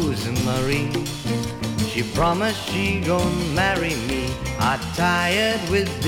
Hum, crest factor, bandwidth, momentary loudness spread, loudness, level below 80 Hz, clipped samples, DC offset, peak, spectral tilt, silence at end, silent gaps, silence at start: none; 14 dB; 18 kHz; 6 LU; -22 LUFS; -38 dBFS; under 0.1%; under 0.1%; -8 dBFS; -4.5 dB/octave; 0 s; none; 0 s